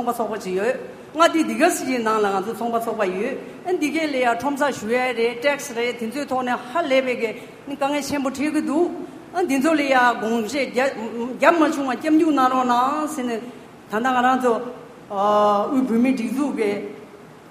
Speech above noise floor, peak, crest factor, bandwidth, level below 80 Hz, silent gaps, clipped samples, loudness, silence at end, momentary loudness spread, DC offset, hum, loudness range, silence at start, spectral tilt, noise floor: 22 dB; 0 dBFS; 22 dB; 15.5 kHz; -64 dBFS; none; under 0.1%; -21 LUFS; 0 s; 11 LU; under 0.1%; none; 4 LU; 0 s; -4 dB/octave; -42 dBFS